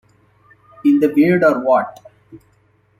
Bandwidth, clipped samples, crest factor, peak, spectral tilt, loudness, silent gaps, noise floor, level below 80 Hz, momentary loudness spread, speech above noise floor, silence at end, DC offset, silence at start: 14.5 kHz; under 0.1%; 16 dB; -2 dBFS; -8.5 dB/octave; -15 LUFS; none; -57 dBFS; -62 dBFS; 6 LU; 43 dB; 0.65 s; under 0.1%; 0.85 s